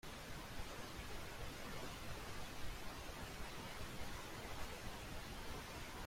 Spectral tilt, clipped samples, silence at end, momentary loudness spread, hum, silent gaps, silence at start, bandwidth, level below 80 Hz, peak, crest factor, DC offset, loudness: -3.5 dB/octave; under 0.1%; 0 s; 1 LU; none; none; 0.05 s; 16.5 kHz; -56 dBFS; -32 dBFS; 16 dB; under 0.1%; -50 LUFS